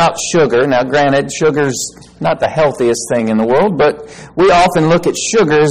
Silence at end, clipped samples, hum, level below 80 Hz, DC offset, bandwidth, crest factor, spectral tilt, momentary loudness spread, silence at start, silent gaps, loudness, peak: 0 s; under 0.1%; none; -42 dBFS; 0.5%; 15.5 kHz; 10 dB; -4.5 dB/octave; 7 LU; 0 s; none; -12 LUFS; -2 dBFS